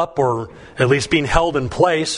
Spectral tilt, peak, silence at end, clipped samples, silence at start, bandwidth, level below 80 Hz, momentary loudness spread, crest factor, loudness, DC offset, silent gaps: -5 dB/octave; 0 dBFS; 0 s; under 0.1%; 0 s; 11 kHz; -34 dBFS; 6 LU; 18 dB; -18 LUFS; under 0.1%; none